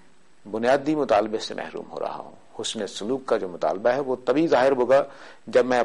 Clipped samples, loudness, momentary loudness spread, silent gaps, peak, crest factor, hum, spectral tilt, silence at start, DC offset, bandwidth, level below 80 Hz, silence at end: under 0.1%; -24 LUFS; 14 LU; none; -10 dBFS; 14 dB; none; -4.5 dB/octave; 0.45 s; 0.4%; 11.5 kHz; -60 dBFS; 0 s